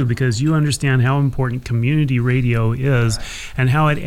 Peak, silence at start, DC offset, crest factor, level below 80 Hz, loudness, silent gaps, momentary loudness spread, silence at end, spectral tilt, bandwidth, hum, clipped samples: -6 dBFS; 0 s; under 0.1%; 12 dB; -36 dBFS; -18 LUFS; none; 5 LU; 0 s; -6.5 dB/octave; 14 kHz; none; under 0.1%